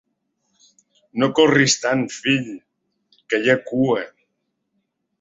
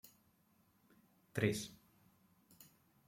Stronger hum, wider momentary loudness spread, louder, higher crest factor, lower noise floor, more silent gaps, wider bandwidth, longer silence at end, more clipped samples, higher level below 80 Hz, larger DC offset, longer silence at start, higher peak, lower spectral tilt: neither; second, 17 LU vs 25 LU; first, -19 LUFS vs -41 LUFS; second, 20 dB vs 26 dB; about the same, -74 dBFS vs -74 dBFS; neither; second, 8 kHz vs 16.5 kHz; first, 1.15 s vs 0.45 s; neither; first, -62 dBFS vs -76 dBFS; neither; second, 1.15 s vs 1.35 s; first, -2 dBFS vs -20 dBFS; about the same, -4 dB/octave vs -5 dB/octave